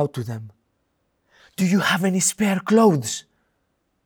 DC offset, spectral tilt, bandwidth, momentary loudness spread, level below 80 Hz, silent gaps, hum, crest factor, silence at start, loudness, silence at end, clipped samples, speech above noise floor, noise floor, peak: under 0.1%; -4.5 dB/octave; over 20 kHz; 16 LU; -66 dBFS; none; none; 16 dB; 0 s; -20 LUFS; 0.85 s; under 0.1%; 51 dB; -71 dBFS; -6 dBFS